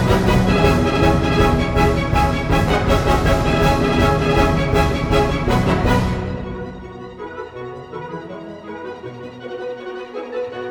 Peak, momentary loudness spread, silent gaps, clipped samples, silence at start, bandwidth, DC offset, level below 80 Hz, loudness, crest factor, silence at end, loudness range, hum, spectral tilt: 0 dBFS; 16 LU; none; under 0.1%; 0 s; 19.5 kHz; under 0.1%; -26 dBFS; -17 LUFS; 16 dB; 0 s; 14 LU; none; -6.5 dB/octave